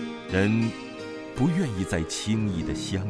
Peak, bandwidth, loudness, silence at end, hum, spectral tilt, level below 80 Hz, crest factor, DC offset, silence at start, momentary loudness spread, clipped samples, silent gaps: -10 dBFS; 11 kHz; -27 LUFS; 0 s; none; -5.5 dB/octave; -46 dBFS; 18 dB; under 0.1%; 0 s; 12 LU; under 0.1%; none